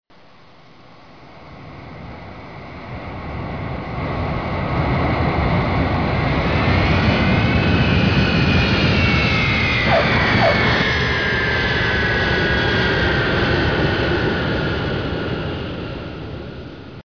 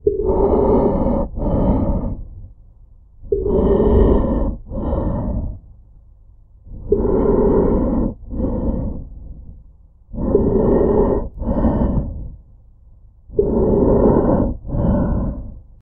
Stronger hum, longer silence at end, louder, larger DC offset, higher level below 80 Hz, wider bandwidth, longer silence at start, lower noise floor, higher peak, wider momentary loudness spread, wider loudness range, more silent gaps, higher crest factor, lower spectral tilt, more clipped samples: neither; second, 0.05 s vs 0.2 s; about the same, -18 LUFS vs -18 LUFS; first, 0.4% vs under 0.1%; second, -30 dBFS vs -24 dBFS; first, 5.4 kHz vs 3.4 kHz; first, 1.2 s vs 0.05 s; about the same, -48 dBFS vs -46 dBFS; second, -4 dBFS vs 0 dBFS; about the same, 17 LU vs 18 LU; first, 13 LU vs 3 LU; neither; about the same, 14 dB vs 18 dB; second, -6.5 dB/octave vs -13.5 dB/octave; neither